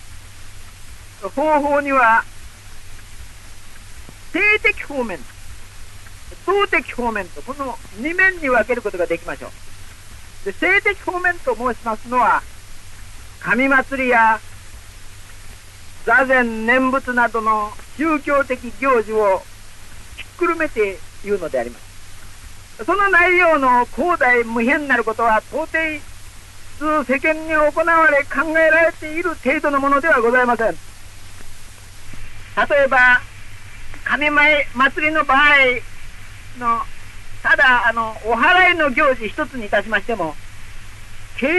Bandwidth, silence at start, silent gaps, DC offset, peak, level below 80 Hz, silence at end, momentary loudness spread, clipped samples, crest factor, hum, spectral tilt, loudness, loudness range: 12 kHz; 0 s; none; under 0.1%; -2 dBFS; -38 dBFS; 0 s; 15 LU; under 0.1%; 16 dB; none; -4 dB/octave; -16 LUFS; 5 LU